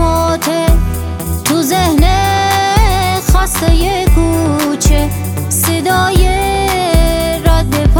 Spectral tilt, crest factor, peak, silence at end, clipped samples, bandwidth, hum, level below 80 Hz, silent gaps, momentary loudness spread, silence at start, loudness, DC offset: -4.5 dB/octave; 10 dB; 0 dBFS; 0 s; under 0.1%; 19 kHz; none; -14 dBFS; none; 4 LU; 0 s; -12 LUFS; under 0.1%